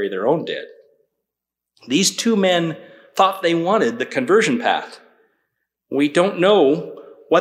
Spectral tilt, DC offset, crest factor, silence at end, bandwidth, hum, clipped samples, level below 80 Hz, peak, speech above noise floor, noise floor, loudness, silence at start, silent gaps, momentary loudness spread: -4 dB/octave; under 0.1%; 18 dB; 0 s; 15.5 kHz; none; under 0.1%; -70 dBFS; -2 dBFS; 66 dB; -84 dBFS; -18 LUFS; 0 s; none; 13 LU